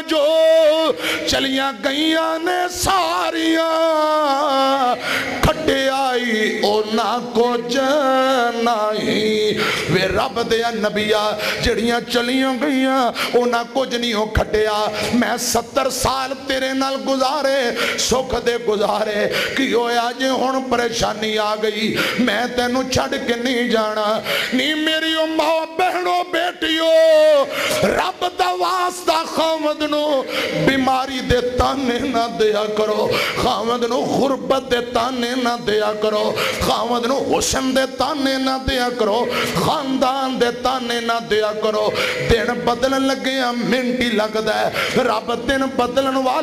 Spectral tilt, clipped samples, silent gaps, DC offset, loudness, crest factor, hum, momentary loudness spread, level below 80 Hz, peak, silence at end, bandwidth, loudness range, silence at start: -3.5 dB/octave; under 0.1%; none; under 0.1%; -18 LUFS; 12 dB; none; 3 LU; -40 dBFS; -6 dBFS; 0 s; 15.5 kHz; 2 LU; 0 s